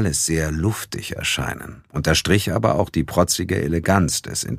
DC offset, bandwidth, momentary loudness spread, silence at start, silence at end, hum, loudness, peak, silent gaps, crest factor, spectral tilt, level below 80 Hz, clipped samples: under 0.1%; 15.5 kHz; 9 LU; 0 s; 0 s; none; -20 LUFS; -2 dBFS; none; 20 dB; -4 dB/octave; -36 dBFS; under 0.1%